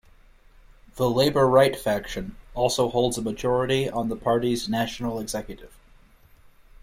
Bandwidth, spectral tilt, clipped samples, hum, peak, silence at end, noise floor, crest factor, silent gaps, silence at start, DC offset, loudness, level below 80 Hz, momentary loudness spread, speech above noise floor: 16.5 kHz; -5 dB/octave; under 0.1%; none; -6 dBFS; 1.15 s; -54 dBFS; 20 dB; none; 0.95 s; under 0.1%; -24 LUFS; -46 dBFS; 15 LU; 30 dB